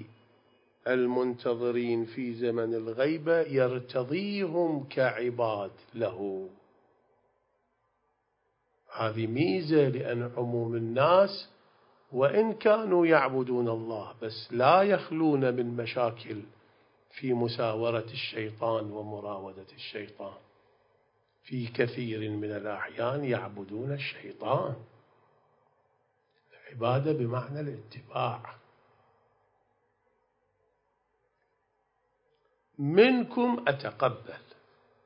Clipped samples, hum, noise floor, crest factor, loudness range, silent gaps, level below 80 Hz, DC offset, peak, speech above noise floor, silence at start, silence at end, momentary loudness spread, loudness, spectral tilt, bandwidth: under 0.1%; none; -76 dBFS; 24 dB; 11 LU; none; -74 dBFS; under 0.1%; -8 dBFS; 47 dB; 0 s; 0.7 s; 17 LU; -29 LUFS; -10.5 dB/octave; 5.4 kHz